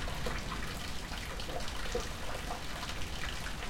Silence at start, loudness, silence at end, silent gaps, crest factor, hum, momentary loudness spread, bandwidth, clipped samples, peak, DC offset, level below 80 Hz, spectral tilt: 0 s; -39 LUFS; 0 s; none; 14 dB; none; 2 LU; 17 kHz; under 0.1%; -22 dBFS; under 0.1%; -44 dBFS; -3.5 dB/octave